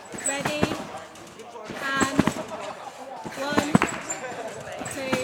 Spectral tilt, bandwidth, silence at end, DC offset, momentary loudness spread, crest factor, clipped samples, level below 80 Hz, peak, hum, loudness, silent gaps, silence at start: -4 dB/octave; over 20 kHz; 0 s; under 0.1%; 16 LU; 26 dB; under 0.1%; -56 dBFS; -2 dBFS; none; -27 LUFS; none; 0 s